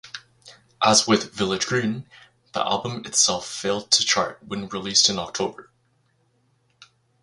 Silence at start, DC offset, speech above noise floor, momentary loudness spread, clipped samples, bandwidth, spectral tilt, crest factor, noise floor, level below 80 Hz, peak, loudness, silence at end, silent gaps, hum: 0.05 s; under 0.1%; 43 dB; 13 LU; under 0.1%; 11.5 kHz; -2 dB/octave; 22 dB; -66 dBFS; -58 dBFS; -2 dBFS; -21 LUFS; 0.4 s; none; none